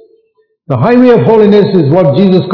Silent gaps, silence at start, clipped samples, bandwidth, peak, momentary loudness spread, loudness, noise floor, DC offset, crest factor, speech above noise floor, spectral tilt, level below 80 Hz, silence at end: none; 0.7 s; 5%; 6 kHz; 0 dBFS; 4 LU; -7 LUFS; -55 dBFS; under 0.1%; 8 dB; 49 dB; -10 dB/octave; -46 dBFS; 0 s